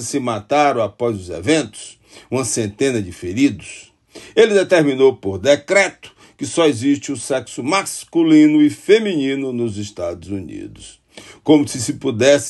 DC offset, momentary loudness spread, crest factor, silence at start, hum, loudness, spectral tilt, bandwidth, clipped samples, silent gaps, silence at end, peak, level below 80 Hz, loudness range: under 0.1%; 15 LU; 16 dB; 0 s; none; -17 LUFS; -4.5 dB/octave; 12.5 kHz; under 0.1%; none; 0 s; 0 dBFS; -54 dBFS; 5 LU